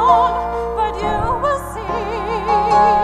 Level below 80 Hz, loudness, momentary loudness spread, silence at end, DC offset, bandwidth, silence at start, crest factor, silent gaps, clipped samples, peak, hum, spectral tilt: -32 dBFS; -18 LUFS; 9 LU; 0 s; under 0.1%; 14 kHz; 0 s; 16 dB; none; under 0.1%; -2 dBFS; none; -5.5 dB/octave